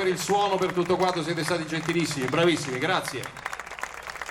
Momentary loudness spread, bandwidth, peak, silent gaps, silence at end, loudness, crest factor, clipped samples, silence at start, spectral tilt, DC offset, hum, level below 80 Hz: 12 LU; 17.5 kHz; -8 dBFS; none; 0 s; -26 LUFS; 18 dB; under 0.1%; 0 s; -4.5 dB/octave; under 0.1%; none; -58 dBFS